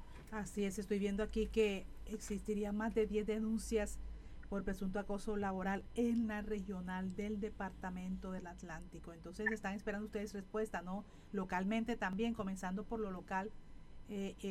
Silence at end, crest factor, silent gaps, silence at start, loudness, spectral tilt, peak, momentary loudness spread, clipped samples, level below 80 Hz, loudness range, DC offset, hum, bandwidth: 0 s; 18 dB; none; 0 s; -41 LUFS; -6 dB/octave; -22 dBFS; 11 LU; under 0.1%; -52 dBFS; 5 LU; under 0.1%; none; 14.5 kHz